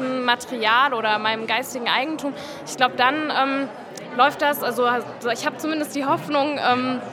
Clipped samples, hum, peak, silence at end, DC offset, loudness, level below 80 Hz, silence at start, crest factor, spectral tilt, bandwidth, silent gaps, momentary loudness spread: under 0.1%; none; -2 dBFS; 0 s; under 0.1%; -21 LUFS; -70 dBFS; 0 s; 20 dB; -3 dB/octave; 17.5 kHz; none; 9 LU